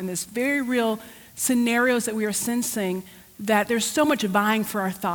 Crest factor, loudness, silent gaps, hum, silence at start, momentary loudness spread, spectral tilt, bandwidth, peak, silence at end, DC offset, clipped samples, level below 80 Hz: 16 dB; -23 LUFS; none; none; 0 s; 8 LU; -3.5 dB/octave; 20 kHz; -8 dBFS; 0 s; under 0.1%; under 0.1%; -62 dBFS